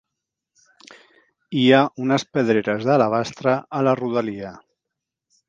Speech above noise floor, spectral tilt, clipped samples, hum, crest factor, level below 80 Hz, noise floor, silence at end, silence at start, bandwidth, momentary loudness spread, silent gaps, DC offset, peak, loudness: 64 dB; -6 dB/octave; under 0.1%; none; 22 dB; -66 dBFS; -83 dBFS; 0.9 s; 1.5 s; 7.6 kHz; 12 LU; none; under 0.1%; 0 dBFS; -20 LUFS